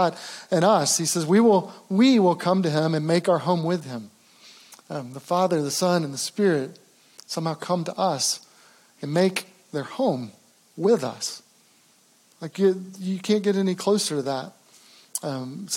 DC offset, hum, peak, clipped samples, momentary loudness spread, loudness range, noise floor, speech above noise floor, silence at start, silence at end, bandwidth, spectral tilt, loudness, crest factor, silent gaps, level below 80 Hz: under 0.1%; none; -6 dBFS; under 0.1%; 15 LU; 6 LU; -59 dBFS; 36 dB; 0 s; 0 s; 17 kHz; -4.5 dB/octave; -23 LUFS; 18 dB; none; -84 dBFS